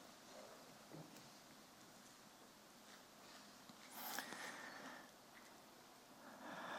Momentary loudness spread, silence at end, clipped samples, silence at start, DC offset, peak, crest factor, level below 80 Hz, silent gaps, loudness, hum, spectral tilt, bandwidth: 13 LU; 0 s; under 0.1%; 0 s; under 0.1%; -28 dBFS; 28 dB; -90 dBFS; none; -56 LUFS; none; -2 dB/octave; 16.5 kHz